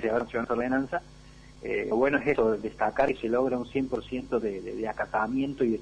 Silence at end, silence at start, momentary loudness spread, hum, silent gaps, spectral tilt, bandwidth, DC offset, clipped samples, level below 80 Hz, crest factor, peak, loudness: 0 s; 0 s; 9 LU; none; none; -7 dB/octave; 10 kHz; under 0.1%; under 0.1%; -52 dBFS; 18 dB; -10 dBFS; -28 LUFS